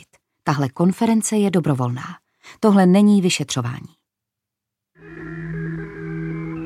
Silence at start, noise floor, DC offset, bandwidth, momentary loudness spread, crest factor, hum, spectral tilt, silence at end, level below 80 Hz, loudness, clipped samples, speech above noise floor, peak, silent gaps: 0.45 s; -84 dBFS; under 0.1%; 13.5 kHz; 17 LU; 18 dB; none; -6 dB/octave; 0 s; -54 dBFS; -19 LUFS; under 0.1%; 66 dB; -2 dBFS; none